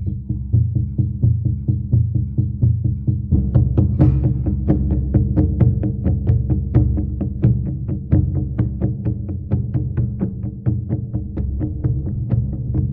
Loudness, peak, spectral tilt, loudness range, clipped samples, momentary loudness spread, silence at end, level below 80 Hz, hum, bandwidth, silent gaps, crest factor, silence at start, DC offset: -20 LUFS; -4 dBFS; -14 dB/octave; 5 LU; under 0.1%; 7 LU; 0 s; -26 dBFS; none; 2.5 kHz; none; 14 dB; 0 s; under 0.1%